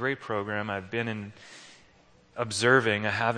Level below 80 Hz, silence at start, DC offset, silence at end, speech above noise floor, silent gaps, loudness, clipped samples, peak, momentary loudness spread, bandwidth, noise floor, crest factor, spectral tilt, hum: -68 dBFS; 0 s; under 0.1%; 0 s; 31 dB; none; -27 LUFS; under 0.1%; -8 dBFS; 24 LU; 10 kHz; -59 dBFS; 22 dB; -4.5 dB/octave; none